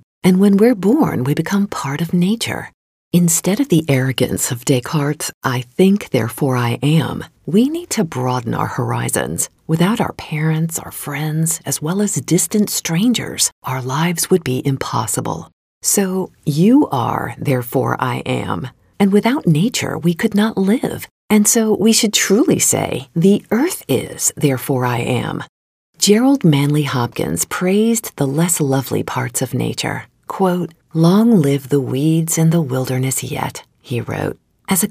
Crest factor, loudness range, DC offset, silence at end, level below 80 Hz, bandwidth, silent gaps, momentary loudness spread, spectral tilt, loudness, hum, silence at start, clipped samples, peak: 16 dB; 4 LU; under 0.1%; 0 s; -52 dBFS; 16 kHz; 2.74-3.11 s, 5.34-5.41 s, 13.52-13.62 s, 15.53-15.81 s, 21.11-21.29 s, 25.49-25.93 s; 10 LU; -5 dB/octave; -16 LUFS; none; 0.25 s; under 0.1%; 0 dBFS